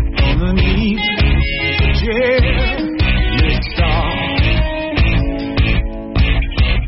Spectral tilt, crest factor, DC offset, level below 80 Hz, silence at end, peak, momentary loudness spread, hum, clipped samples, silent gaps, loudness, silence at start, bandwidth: -9.5 dB/octave; 10 dB; 0.2%; -16 dBFS; 0 s; -4 dBFS; 3 LU; none; under 0.1%; none; -16 LUFS; 0 s; 5.8 kHz